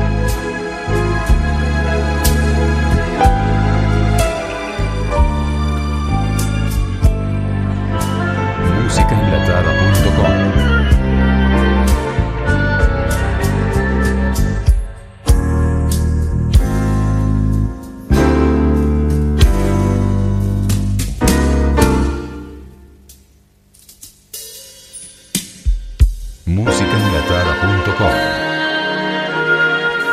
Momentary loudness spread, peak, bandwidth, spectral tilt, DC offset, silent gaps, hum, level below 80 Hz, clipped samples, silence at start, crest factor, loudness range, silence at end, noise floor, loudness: 8 LU; 0 dBFS; 15.5 kHz; -6 dB/octave; under 0.1%; none; 50 Hz at -40 dBFS; -18 dBFS; under 0.1%; 0 s; 14 dB; 6 LU; 0 s; -50 dBFS; -16 LUFS